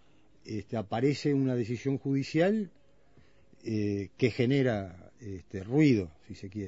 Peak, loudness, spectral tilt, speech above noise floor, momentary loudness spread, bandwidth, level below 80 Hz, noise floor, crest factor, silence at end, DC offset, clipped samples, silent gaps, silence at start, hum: -12 dBFS; -30 LUFS; -7.5 dB/octave; 33 dB; 17 LU; 8 kHz; -64 dBFS; -63 dBFS; 18 dB; 0 s; 0.1%; under 0.1%; none; 0.45 s; none